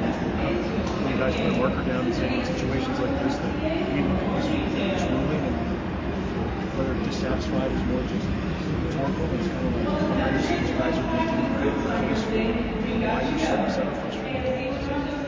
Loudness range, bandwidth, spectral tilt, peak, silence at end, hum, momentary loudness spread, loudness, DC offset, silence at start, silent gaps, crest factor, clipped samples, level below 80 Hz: 2 LU; 7.6 kHz; -7 dB/octave; -10 dBFS; 0 s; none; 4 LU; -26 LUFS; under 0.1%; 0 s; none; 16 dB; under 0.1%; -36 dBFS